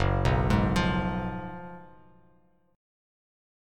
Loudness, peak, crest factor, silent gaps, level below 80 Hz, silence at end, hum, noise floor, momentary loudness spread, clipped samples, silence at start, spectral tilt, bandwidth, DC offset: -27 LUFS; -10 dBFS; 18 dB; none; -38 dBFS; 1.9 s; none; -65 dBFS; 19 LU; under 0.1%; 0 s; -7 dB/octave; 13 kHz; under 0.1%